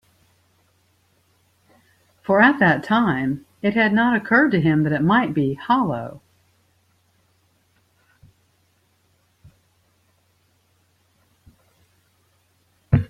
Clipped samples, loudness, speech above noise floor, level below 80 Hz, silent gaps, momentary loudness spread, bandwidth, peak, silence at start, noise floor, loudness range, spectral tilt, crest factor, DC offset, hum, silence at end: under 0.1%; -19 LUFS; 46 dB; -50 dBFS; none; 10 LU; 10.5 kHz; -2 dBFS; 2.3 s; -64 dBFS; 10 LU; -8 dB/octave; 20 dB; under 0.1%; none; 0.05 s